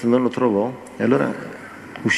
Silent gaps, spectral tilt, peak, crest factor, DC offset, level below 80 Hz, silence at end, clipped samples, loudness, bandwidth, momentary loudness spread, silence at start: none; -6 dB/octave; -4 dBFS; 18 dB; under 0.1%; -64 dBFS; 0 s; under 0.1%; -21 LUFS; 11.5 kHz; 16 LU; 0 s